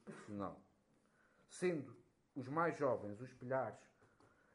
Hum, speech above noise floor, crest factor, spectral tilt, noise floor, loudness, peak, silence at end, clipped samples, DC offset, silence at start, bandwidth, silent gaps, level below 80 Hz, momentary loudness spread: none; 34 dB; 20 dB; -6.5 dB/octave; -76 dBFS; -43 LUFS; -24 dBFS; 0.7 s; under 0.1%; under 0.1%; 0.05 s; 11.5 kHz; none; -84 dBFS; 19 LU